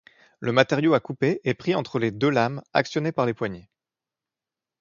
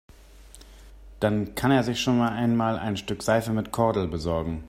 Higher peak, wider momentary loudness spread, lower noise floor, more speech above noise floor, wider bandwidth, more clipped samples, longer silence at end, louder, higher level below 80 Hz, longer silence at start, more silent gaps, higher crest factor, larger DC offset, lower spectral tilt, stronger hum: first, -2 dBFS vs -8 dBFS; first, 9 LU vs 6 LU; first, -89 dBFS vs -49 dBFS; first, 66 dB vs 24 dB; second, 7.4 kHz vs 16 kHz; neither; first, 1.2 s vs 0 s; about the same, -24 LUFS vs -25 LUFS; second, -64 dBFS vs -46 dBFS; about the same, 0.4 s vs 0.35 s; neither; first, 24 dB vs 18 dB; neither; about the same, -6.5 dB/octave vs -6 dB/octave; neither